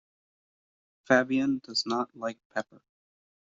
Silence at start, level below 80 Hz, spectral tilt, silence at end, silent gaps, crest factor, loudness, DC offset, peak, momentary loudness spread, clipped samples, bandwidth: 1.1 s; -74 dBFS; -2.5 dB/octave; 0.95 s; 2.45-2.50 s; 24 dB; -29 LUFS; under 0.1%; -8 dBFS; 13 LU; under 0.1%; 7.8 kHz